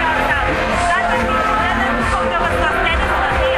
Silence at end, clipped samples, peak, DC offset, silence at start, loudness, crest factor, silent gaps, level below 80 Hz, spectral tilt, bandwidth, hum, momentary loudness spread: 0 s; under 0.1%; -2 dBFS; under 0.1%; 0 s; -16 LUFS; 14 dB; none; -26 dBFS; -4.5 dB/octave; 15.5 kHz; none; 1 LU